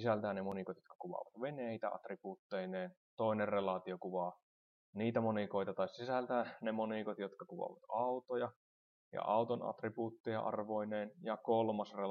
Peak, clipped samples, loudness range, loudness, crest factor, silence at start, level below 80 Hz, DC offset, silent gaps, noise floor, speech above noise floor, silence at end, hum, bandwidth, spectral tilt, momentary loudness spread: -22 dBFS; under 0.1%; 2 LU; -41 LUFS; 18 dB; 0 s; -88 dBFS; under 0.1%; 0.95-0.99 s, 2.39-2.50 s, 2.97-3.17 s, 4.43-4.93 s, 8.56-9.12 s, 10.20-10.24 s; under -90 dBFS; over 50 dB; 0 s; none; 6.6 kHz; -8 dB/octave; 11 LU